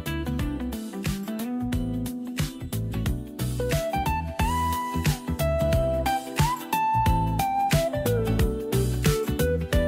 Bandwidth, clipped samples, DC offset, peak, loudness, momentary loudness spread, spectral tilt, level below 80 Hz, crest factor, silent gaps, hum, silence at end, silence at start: 16 kHz; under 0.1%; under 0.1%; -10 dBFS; -26 LUFS; 7 LU; -5.5 dB/octave; -34 dBFS; 16 dB; none; none; 0 s; 0 s